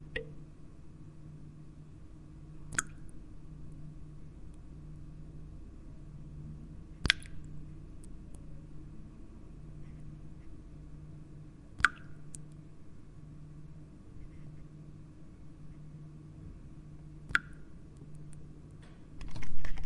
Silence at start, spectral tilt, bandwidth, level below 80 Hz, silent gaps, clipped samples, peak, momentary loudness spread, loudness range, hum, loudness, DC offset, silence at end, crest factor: 0 s; -3 dB/octave; 11 kHz; -50 dBFS; none; under 0.1%; 0 dBFS; 20 LU; 13 LU; none; -42 LUFS; under 0.1%; 0 s; 34 dB